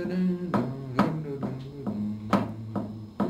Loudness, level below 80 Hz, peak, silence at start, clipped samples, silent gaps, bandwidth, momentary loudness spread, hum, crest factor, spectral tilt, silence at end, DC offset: -30 LUFS; -56 dBFS; -10 dBFS; 0 s; under 0.1%; none; 13 kHz; 8 LU; none; 20 dB; -8.5 dB/octave; 0 s; under 0.1%